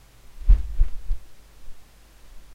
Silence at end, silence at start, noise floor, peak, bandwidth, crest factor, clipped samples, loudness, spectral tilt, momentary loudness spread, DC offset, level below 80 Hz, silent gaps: 0 s; 0.3 s; -48 dBFS; -4 dBFS; 4.1 kHz; 20 dB; under 0.1%; -28 LUFS; -6.5 dB/octave; 14 LU; under 0.1%; -24 dBFS; none